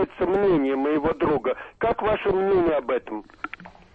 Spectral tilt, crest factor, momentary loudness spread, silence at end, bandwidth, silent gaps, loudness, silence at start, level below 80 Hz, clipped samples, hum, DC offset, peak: -8.5 dB/octave; 10 dB; 16 LU; 0.25 s; 4.9 kHz; none; -23 LUFS; 0 s; -48 dBFS; under 0.1%; none; under 0.1%; -12 dBFS